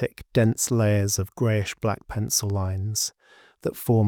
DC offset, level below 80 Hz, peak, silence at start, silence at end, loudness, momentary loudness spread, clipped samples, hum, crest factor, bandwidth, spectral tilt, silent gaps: under 0.1%; -52 dBFS; -8 dBFS; 0 s; 0 s; -25 LUFS; 8 LU; under 0.1%; none; 16 dB; 20 kHz; -5 dB/octave; none